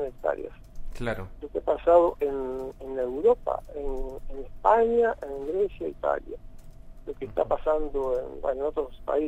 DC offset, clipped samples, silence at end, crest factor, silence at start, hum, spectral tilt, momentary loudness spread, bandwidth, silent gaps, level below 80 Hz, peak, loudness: under 0.1%; under 0.1%; 0 s; 20 dB; 0 s; none; -7.5 dB/octave; 18 LU; 9.6 kHz; none; -42 dBFS; -6 dBFS; -27 LUFS